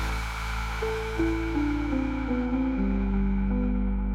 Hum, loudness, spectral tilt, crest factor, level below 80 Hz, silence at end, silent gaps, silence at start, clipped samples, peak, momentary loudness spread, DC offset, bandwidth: none; -28 LUFS; -7 dB/octave; 12 dB; -30 dBFS; 0 s; none; 0 s; under 0.1%; -16 dBFS; 4 LU; under 0.1%; 14 kHz